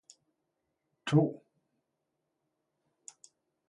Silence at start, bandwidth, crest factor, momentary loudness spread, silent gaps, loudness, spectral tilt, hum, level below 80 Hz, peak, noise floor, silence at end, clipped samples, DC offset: 1.05 s; 11 kHz; 24 dB; 25 LU; none; -30 LUFS; -7 dB/octave; none; -76 dBFS; -14 dBFS; -84 dBFS; 2.35 s; under 0.1%; under 0.1%